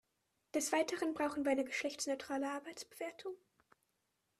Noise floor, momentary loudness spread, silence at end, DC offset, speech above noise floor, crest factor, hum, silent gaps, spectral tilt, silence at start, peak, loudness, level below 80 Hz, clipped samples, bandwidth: -84 dBFS; 13 LU; 1.05 s; under 0.1%; 45 dB; 20 dB; none; none; -2 dB/octave; 0.55 s; -20 dBFS; -39 LUFS; -80 dBFS; under 0.1%; 14 kHz